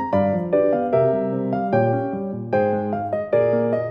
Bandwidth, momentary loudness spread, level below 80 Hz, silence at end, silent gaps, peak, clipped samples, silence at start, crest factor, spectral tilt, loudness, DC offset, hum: 5.4 kHz; 5 LU; -58 dBFS; 0 s; none; -6 dBFS; under 0.1%; 0 s; 14 dB; -10.5 dB/octave; -21 LUFS; under 0.1%; none